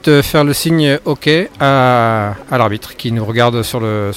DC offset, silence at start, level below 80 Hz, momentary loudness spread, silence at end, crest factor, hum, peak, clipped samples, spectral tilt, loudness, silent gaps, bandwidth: under 0.1%; 0.05 s; -40 dBFS; 7 LU; 0 s; 12 dB; none; 0 dBFS; under 0.1%; -5.5 dB/octave; -13 LUFS; none; 17 kHz